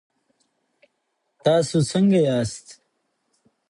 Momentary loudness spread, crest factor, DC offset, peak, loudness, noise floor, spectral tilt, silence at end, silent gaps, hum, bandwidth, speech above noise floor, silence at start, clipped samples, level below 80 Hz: 10 LU; 18 dB; under 0.1%; -6 dBFS; -21 LUFS; -74 dBFS; -6 dB/octave; 0.95 s; none; none; 11 kHz; 55 dB; 1.45 s; under 0.1%; -58 dBFS